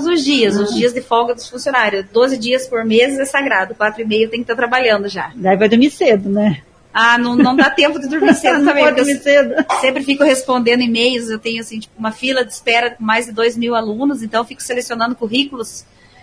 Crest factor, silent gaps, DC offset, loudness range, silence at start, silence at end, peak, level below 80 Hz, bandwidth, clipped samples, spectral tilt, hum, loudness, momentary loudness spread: 14 dB; none; under 0.1%; 5 LU; 0 s; 0.4 s; 0 dBFS; -54 dBFS; 11 kHz; under 0.1%; -4 dB/octave; none; -14 LUFS; 9 LU